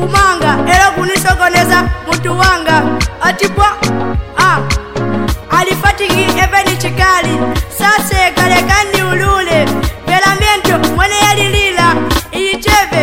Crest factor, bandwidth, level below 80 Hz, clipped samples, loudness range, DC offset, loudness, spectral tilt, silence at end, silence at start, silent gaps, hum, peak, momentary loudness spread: 10 dB; 17 kHz; -22 dBFS; under 0.1%; 2 LU; 2%; -10 LUFS; -4 dB/octave; 0 s; 0 s; none; none; 0 dBFS; 6 LU